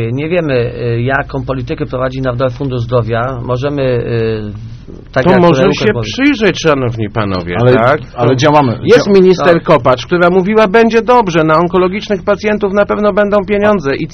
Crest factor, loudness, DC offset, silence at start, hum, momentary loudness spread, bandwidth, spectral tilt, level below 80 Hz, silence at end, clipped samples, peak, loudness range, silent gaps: 10 dB; -11 LUFS; under 0.1%; 0 s; none; 9 LU; 6.8 kHz; -6.5 dB/octave; -34 dBFS; 0 s; 0.6%; 0 dBFS; 7 LU; none